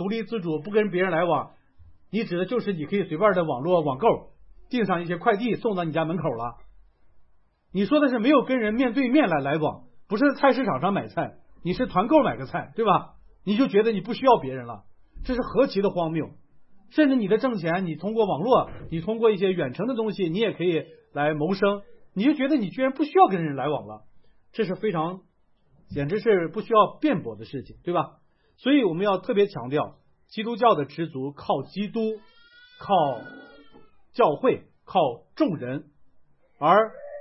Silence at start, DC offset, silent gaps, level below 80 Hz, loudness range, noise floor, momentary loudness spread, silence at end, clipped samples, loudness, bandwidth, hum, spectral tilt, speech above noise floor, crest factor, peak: 0 s; under 0.1%; none; -54 dBFS; 4 LU; -61 dBFS; 13 LU; 0 s; under 0.1%; -24 LUFS; 5.8 kHz; none; -10.5 dB/octave; 38 dB; 20 dB; -6 dBFS